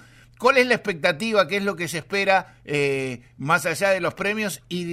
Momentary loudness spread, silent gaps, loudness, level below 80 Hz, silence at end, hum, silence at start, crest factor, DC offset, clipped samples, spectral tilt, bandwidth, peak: 9 LU; none; -22 LUFS; -58 dBFS; 0 s; none; 0.4 s; 18 dB; under 0.1%; under 0.1%; -4 dB/octave; 16 kHz; -4 dBFS